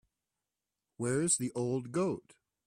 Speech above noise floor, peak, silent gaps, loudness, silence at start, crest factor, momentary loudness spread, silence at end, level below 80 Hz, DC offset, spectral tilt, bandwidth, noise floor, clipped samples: 57 dB; -18 dBFS; none; -33 LUFS; 1 s; 18 dB; 8 LU; 0.45 s; -72 dBFS; under 0.1%; -4.5 dB/octave; 15 kHz; -90 dBFS; under 0.1%